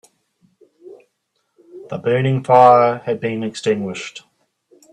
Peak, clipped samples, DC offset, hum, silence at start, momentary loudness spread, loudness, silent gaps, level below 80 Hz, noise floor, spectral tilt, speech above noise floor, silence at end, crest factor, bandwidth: 0 dBFS; under 0.1%; under 0.1%; none; 0.85 s; 18 LU; -16 LUFS; none; -62 dBFS; -70 dBFS; -6.5 dB/octave; 55 dB; 0.75 s; 18 dB; 10.5 kHz